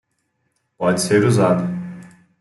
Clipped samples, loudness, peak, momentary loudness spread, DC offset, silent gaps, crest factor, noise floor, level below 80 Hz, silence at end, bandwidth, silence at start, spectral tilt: under 0.1%; -18 LUFS; -2 dBFS; 17 LU; under 0.1%; none; 16 dB; -70 dBFS; -58 dBFS; 0.35 s; 12.5 kHz; 0.8 s; -6 dB/octave